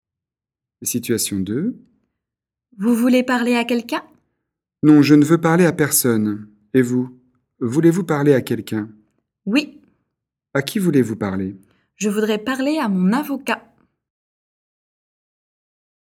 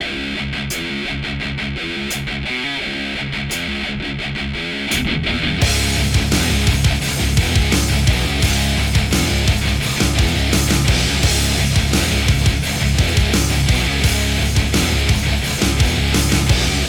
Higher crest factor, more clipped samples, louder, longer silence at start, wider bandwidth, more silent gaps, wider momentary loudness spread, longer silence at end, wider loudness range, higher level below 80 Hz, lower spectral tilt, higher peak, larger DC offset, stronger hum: about the same, 20 dB vs 16 dB; neither; about the same, -18 LUFS vs -17 LUFS; first, 0.8 s vs 0 s; second, 17.5 kHz vs 19.5 kHz; neither; first, 13 LU vs 7 LU; first, 2.55 s vs 0 s; about the same, 7 LU vs 6 LU; second, -62 dBFS vs -22 dBFS; first, -5.5 dB/octave vs -4 dB/octave; about the same, 0 dBFS vs -2 dBFS; neither; neither